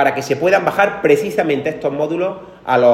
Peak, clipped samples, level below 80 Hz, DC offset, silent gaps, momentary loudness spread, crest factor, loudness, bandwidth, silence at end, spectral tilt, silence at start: 0 dBFS; under 0.1%; -54 dBFS; under 0.1%; none; 7 LU; 16 dB; -16 LUFS; 15.5 kHz; 0 s; -5.5 dB/octave; 0 s